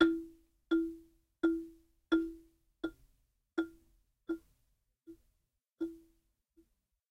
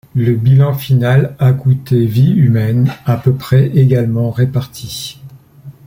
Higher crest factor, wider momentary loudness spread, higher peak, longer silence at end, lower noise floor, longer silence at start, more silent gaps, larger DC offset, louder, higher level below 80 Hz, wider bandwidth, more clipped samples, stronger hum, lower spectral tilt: first, 26 dB vs 10 dB; first, 22 LU vs 10 LU; second, -12 dBFS vs -2 dBFS; first, 1.15 s vs 0.15 s; first, -82 dBFS vs -36 dBFS; second, 0 s vs 0.15 s; neither; neither; second, -38 LUFS vs -12 LUFS; second, -66 dBFS vs -44 dBFS; second, 6 kHz vs 16.5 kHz; neither; neither; second, -5.5 dB/octave vs -8 dB/octave